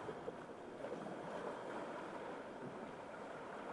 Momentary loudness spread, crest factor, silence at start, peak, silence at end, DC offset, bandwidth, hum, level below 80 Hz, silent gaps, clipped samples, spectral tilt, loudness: 4 LU; 16 dB; 0 s; -34 dBFS; 0 s; under 0.1%; 11.5 kHz; none; -78 dBFS; none; under 0.1%; -5.5 dB/octave; -49 LUFS